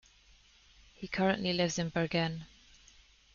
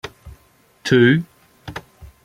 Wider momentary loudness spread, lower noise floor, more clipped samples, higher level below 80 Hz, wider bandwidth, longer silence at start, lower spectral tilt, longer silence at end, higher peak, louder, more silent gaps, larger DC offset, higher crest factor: second, 16 LU vs 24 LU; first, -63 dBFS vs -55 dBFS; neither; second, -62 dBFS vs -50 dBFS; second, 7.2 kHz vs 14.5 kHz; first, 1 s vs 0.05 s; second, -4 dB/octave vs -6.5 dB/octave; first, 0.9 s vs 0.2 s; second, -14 dBFS vs -2 dBFS; second, -32 LUFS vs -16 LUFS; neither; neither; about the same, 22 dB vs 20 dB